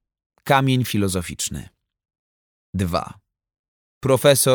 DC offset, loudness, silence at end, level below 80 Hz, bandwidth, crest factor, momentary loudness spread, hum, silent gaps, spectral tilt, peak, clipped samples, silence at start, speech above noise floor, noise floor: under 0.1%; -20 LUFS; 0 s; -48 dBFS; over 20 kHz; 20 dB; 17 LU; none; 2.19-2.73 s, 3.59-4.01 s; -4.5 dB/octave; -2 dBFS; under 0.1%; 0.45 s; over 71 dB; under -90 dBFS